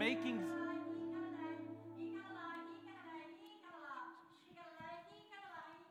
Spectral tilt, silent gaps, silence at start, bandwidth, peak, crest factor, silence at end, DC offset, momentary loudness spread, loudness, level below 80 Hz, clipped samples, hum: -5 dB/octave; none; 0 s; 13 kHz; -22 dBFS; 24 dB; 0 s; under 0.1%; 15 LU; -48 LUFS; under -90 dBFS; under 0.1%; none